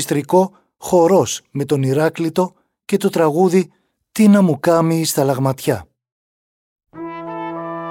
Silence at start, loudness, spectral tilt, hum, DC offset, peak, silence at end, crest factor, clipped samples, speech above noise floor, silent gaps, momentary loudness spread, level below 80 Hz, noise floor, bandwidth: 0 s; -17 LUFS; -6 dB/octave; none; under 0.1%; -2 dBFS; 0 s; 14 dB; under 0.1%; over 75 dB; 6.12-6.76 s; 15 LU; -58 dBFS; under -90 dBFS; 17 kHz